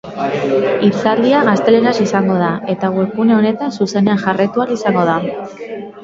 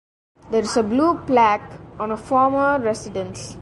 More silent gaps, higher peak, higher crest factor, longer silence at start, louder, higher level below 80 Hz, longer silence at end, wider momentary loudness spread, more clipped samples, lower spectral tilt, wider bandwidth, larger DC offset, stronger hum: neither; first, 0 dBFS vs -4 dBFS; about the same, 14 dB vs 16 dB; second, 0.05 s vs 0.45 s; first, -14 LUFS vs -20 LUFS; second, -56 dBFS vs -50 dBFS; about the same, 0 s vs 0 s; second, 8 LU vs 12 LU; neither; first, -6.5 dB/octave vs -5 dB/octave; second, 7.6 kHz vs 11.5 kHz; neither; neither